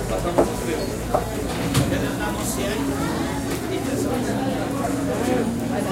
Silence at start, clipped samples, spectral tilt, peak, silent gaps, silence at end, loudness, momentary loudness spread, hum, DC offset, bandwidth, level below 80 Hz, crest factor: 0 s; under 0.1%; -5 dB/octave; -4 dBFS; none; 0 s; -24 LUFS; 4 LU; none; 0.1%; 16.5 kHz; -36 dBFS; 20 dB